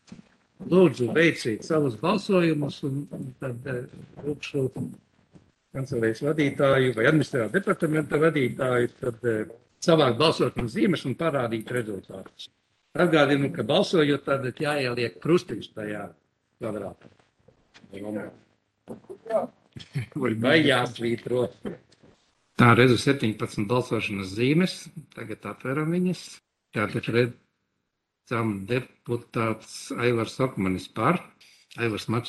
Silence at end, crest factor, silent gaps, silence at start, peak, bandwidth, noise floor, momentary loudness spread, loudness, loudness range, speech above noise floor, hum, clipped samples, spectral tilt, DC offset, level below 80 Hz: 0 s; 24 dB; none; 0.1 s; -2 dBFS; 12.5 kHz; -80 dBFS; 17 LU; -25 LUFS; 9 LU; 55 dB; none; under 0.1%; -6 dB/octave; under 0.1%; -60 dBFS